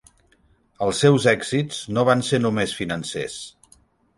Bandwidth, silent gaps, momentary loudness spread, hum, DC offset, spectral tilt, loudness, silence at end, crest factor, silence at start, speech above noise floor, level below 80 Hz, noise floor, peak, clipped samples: 11.5 kHz; none; 13 LU; none; under 0.1%; -5 dB/octave; -21 LUFS; 0.7 s; 20 dB; 0.8 s; 40 dB; -54 dBFS; -60 dBFS; -2 dBFS; under 0.1%